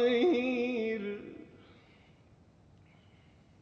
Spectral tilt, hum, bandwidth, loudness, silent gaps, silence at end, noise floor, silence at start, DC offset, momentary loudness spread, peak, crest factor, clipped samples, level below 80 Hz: -6 dB/octave; none; 6.8 kHz; -31 LUFS; none; 2.05 s; -61 dBFS; 0 s; under 0.1%; 24 LU; -18 dBFS; 16 dB; under 0.1%; -70 dBFS